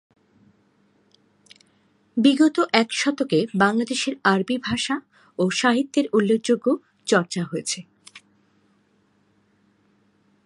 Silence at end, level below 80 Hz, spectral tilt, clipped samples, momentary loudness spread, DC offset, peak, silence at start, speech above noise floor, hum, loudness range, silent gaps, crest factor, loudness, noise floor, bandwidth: 2.3 s; -64 dBFS; -4.5 dB/octave; under 0.1%; 9 LU; under 0.1%; 0 dBFS; 2.15 s; 43 dB; none; 7 LU; none; 24 dB; -22 LUFS; -63 dBFS; 11.5 kHz